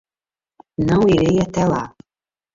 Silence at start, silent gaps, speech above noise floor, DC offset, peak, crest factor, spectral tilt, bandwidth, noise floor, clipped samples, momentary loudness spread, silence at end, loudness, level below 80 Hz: 0.8 s; none; over 74 dB; under 0.1%; -4 dBFS; 14 dB; -7 dB/octave; 7.6 kHz; under -90 dBFS; under 0.1%; 15 LU; 0.65 s; -17 LUFS; -42 dBFS